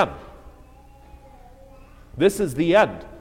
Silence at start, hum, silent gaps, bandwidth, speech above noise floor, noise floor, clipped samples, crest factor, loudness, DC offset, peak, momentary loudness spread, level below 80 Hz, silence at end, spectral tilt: 0 s; none; none; 16.5 kHz; 28 dB; -48 dBFS; under 0.1%; 20 dB; -20 LUFS; under 0.1%; -4 dBFS; 20 LU; -46 dBFS; 0 s; -5.5 dB/octave